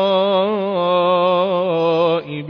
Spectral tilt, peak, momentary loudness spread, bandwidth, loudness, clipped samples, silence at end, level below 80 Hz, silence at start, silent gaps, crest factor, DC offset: -8 dB/octave; -4 dBFS; 3 LU; 5.4 kHz; -17 LUFS; under 0.1%; 0 s; -66 dBFS; 0 s; none; 12 dB; under 0.1%